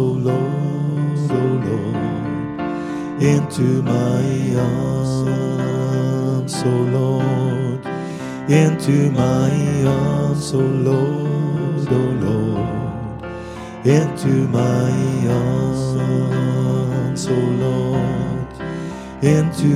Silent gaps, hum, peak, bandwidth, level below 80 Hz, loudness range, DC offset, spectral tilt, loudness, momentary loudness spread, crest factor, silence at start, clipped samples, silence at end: none; none; -2 dBFS; 12.5 kHz; -44 dBFS; 2 LU; under 0.1%; -7.5 dB/octave; -19 LUFS; 9 LU; 16 dB; 0 s; under 0.1%; 0 s